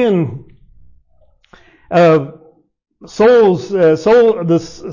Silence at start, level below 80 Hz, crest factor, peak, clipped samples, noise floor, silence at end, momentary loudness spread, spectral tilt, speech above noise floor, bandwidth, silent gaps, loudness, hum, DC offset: 0 s; -50 dBFS; 10 dB; -4 dBFS; under 0.1%; -53 dBFS; 0 s; 15 LU; -7 dB/octave; 41 dB; 7.4 kHz; none; -12 LUFS; none; under 0.1%